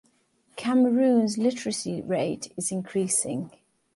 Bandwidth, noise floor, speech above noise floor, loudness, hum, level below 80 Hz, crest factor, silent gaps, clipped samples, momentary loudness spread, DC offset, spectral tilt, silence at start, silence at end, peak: 11.5 kHz; -66 dBFS; 41 dB; -25 LUFS; none; -68 dBFS; 16 dB; none; under 0.1%; 12 LU; under 0.1%; -4.5 dB/octave; 0.55 s; 0.5 s; -10 dBFS